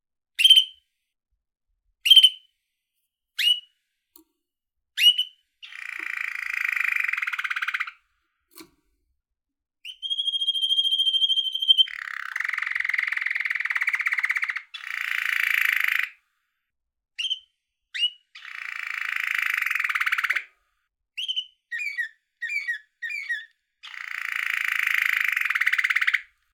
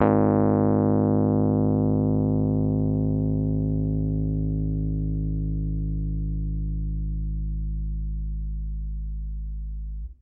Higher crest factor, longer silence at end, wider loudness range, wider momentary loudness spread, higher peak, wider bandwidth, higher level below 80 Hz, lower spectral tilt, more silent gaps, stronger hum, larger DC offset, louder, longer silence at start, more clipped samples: first, 24 dB vs 18 dB; first, 0.3 s vs 0.1 s; about the same, 9 LU vs 9 LU; first, 16 LU vs 13 LU; about the same, -4 dBFS vs -6 dBFS; first, 20 kHz vs 2.8 kHz; second, -80 dBFS vs -30 dBFS; second, 5.5 dB/octave vs -14.5 dB/octave; neither; second, none vs 50 Hz at -100 dBFS; neither; first, -22 LUFS vs -25 LUFS; first, 0.4 s vs 0 s; neither